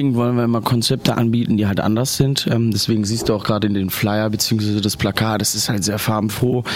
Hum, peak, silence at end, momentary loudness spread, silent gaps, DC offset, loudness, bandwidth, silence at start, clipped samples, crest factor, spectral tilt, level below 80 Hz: none; -2 dBFS; 0 s; 2 LU; none; under 0.1%; -18 LUFS; 16.5 kHz; 0 s; under 0.1%; 16 dB; -5 dB/octave; -46 dBFS